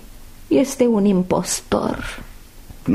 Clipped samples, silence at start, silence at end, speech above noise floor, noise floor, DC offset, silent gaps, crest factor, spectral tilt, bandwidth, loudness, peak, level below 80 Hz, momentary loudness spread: under 0.1%; 0.05 s; 0 s; 21 dB; -39 dBFS; under 0.1%; none; 16 dB; -5.5 dB/octave; 15.5 kHz; -19 LUFS; -4 dBFS; -40 dBFS; 13 LU